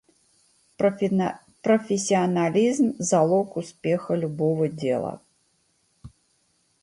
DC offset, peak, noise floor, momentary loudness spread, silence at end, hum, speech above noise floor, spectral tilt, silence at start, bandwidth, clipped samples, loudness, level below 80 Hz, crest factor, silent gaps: under 0.1%; -8 dBFS; -68 dBFS; 9 LU; 0.75 s; none; 45 dB; -6 dB/octave; 0.8 s; 11.5 kHz; under 0.1%; -24 LUFS; -64 dBFS; 18 dB; none